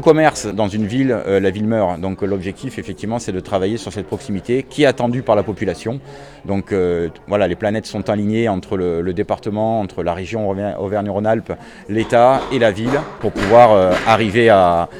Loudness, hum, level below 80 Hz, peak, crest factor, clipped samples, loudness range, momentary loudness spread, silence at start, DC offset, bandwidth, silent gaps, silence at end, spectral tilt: -17 LUFS; none; -44 dBFS; 0 dBFS; 16 dB; under 0.1%; 6 LU; 12 LU; 0 s; under 0.1%; 12.5 kHz; none; 0 s; -6 dB/octave